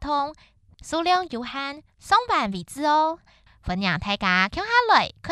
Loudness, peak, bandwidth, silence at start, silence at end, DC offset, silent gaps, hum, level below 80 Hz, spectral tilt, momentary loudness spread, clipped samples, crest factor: -23 LUFS; -4 dBFS; 13 kHz; 0 s; 0 s; under 0.1%; none; none; -48 dBFS; -4 dB/octave; 12 LU; under 0.1%; 20 dB